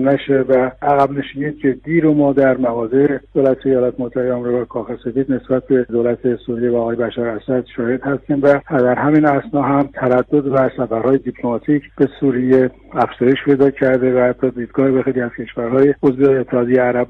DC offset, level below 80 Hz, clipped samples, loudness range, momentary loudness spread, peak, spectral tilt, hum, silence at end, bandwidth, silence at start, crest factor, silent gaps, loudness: under 0.1%; -48 dBFS; under 0.1%; 3 LU; 7 LU; -2 dBFS; -9.5 dB/octave; none; 0.05 s; 4.4 kHz; 0 s; 14 dB; none; -16 LUFS